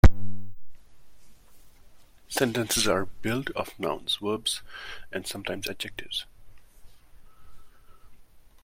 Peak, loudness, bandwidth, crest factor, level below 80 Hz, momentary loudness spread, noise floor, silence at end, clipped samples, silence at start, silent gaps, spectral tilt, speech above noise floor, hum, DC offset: -2 dBFS; -29 LUFS; 16.5 kHz; 24 dB; -36 dBFS; 17 LU; -52 dBFS; 0.25 s; under 0.1%; 0.05 s; none; -4 dB/octave; 22 dB; none; under 0.1%